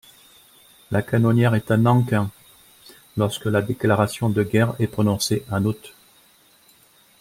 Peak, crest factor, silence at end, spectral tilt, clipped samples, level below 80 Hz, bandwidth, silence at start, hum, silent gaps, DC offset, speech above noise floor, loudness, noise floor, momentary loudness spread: -4 dBFS; 18 dB; 1.3 s; -6.5 dB/octave; under 0.1%; -56 dBFS; 16 kHz; 0.9 s; none; none; under 0.1%; 36 dB; -21 LUFS; -55 dBFS; 8 LU